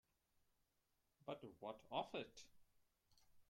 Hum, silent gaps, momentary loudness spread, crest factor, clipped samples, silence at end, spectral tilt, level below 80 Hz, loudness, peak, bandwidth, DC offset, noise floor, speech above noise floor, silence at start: none; none; 15 LU; 24 dB; under 0.1%; 0.05 s; -4.5 dB/octave; -84 dBFS; -52 LUFS; -32 dBFS; 16.5 kHz; under 0.1%; -86 dBFS; 35 dB; 1.25 s